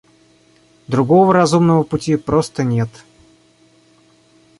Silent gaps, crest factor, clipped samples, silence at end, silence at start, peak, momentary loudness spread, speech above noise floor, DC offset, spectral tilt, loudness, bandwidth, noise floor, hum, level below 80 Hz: none; 16 dB; under 0.1%; 1.7 s; 0.9 s; -2 dBFS; 9 LU; 38 dB; under 0.1%; -7 dB/octave; -15 LUFS; 11.5 kHz; -53 dBFS; none; -48 dBFS